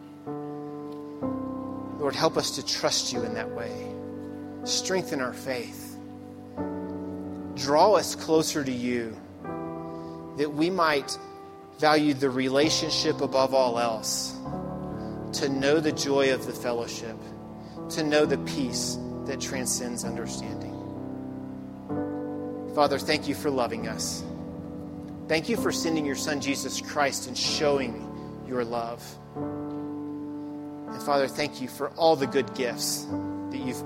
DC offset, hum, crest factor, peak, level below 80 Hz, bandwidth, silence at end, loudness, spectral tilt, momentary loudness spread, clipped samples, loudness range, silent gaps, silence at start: under 0.1%; none; 22 dB; -6 dBFS; -58 dBFS; 16 kHz; 0 s; -28 LUFS; -3.5 dB/octave; 15 LU; under 0.1%; 7 LU; none; 0 s